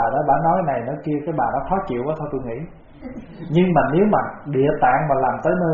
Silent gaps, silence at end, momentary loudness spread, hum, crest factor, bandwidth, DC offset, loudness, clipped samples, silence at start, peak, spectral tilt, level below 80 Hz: none; 0 s; 18 LU; none; 16 dB; 6.8 kHz; under 0.1%; -20 LUFS; under 0.1%; 0 s; -4 dBFS; -7 dB/octave; -44 dBFS